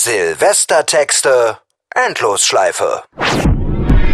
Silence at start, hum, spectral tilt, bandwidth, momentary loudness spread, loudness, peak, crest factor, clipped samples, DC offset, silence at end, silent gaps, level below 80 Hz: 0 s; none; -3 dB/octave; 14 kHz; 7 LU; -13 LUFS; 0 dBFS; 12 dB; under 0.1%; under 0.1%; 0 s; none; -22 dBFS